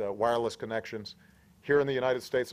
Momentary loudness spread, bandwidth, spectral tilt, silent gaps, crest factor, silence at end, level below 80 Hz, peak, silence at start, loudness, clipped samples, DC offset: 15 LU; 15 kHz; -5 dB/octave; none; 16 dB; 0 s; -66 dBFS; -14 dBFS; 0 s; -30 LUFS; under 0.1%; under 0.1%